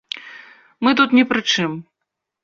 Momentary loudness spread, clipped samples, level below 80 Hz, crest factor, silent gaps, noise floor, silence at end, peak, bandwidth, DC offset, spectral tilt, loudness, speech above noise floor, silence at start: 18 LU; under 0.1%; -62 dBFS; 18 dB; none; -80 dBFS; 0.6 s; -2 dBFS; 7.4 kHz; under 0.1%; -4 dB/octave; -17 LUFS; 63 dB; 0.15 s